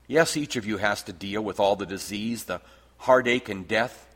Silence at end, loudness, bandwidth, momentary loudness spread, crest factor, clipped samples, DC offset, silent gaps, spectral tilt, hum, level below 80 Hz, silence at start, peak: 0.15 s; -26 LUFS; 16.5 kHz; 11 LU; 22 dB; under 0.1%; under 0.1%; none; -4 dB/octave; none; -58 dBFS; 0.1 s; -4 dBFS